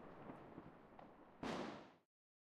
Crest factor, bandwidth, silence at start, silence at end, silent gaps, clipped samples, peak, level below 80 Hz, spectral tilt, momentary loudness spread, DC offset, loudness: 20 dB; 13 kHz; 0 s; 0.55 s; none; under 0.1%; -34 dBFS; -76 dBFS; -5.5 dB/octave; 15 LU; under 0.1%; -53 LUFS